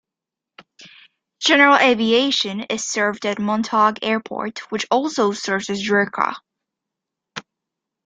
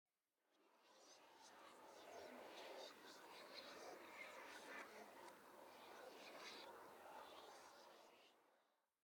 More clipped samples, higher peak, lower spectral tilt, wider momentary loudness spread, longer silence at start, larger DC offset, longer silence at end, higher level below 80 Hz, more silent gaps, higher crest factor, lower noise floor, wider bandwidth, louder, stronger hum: neither; first, 0 dBFS vs -44 dBFS; first, -3 dB/octave vs -1.5 dB/octave; first, 15 LU vs 9 LU; first, 0.8 s vs 0.5 s; neither; first, 0.65 s vs 0.3 s; first, -66 dBFS vs under -90 dBFS; neither; about the same, 20 dB vs 18 dB; about the same, -86 dBFS vs -89 dBFS; second, 9.4 kHz vs 19 kHz; first, -18 LUFS vs -60 LUFS; neither